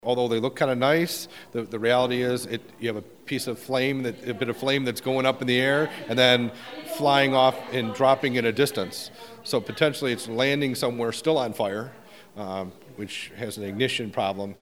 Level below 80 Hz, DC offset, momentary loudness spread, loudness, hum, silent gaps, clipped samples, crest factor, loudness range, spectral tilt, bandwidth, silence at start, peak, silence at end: -68 dBFS; 0.1%; 13 LU; -25 LUFS; none; none; under 0.1%; 22 dB; 6 LU; -4.5 dB/octave; 17 kHz; 0.05 s; -4 dBFS; 0.1 s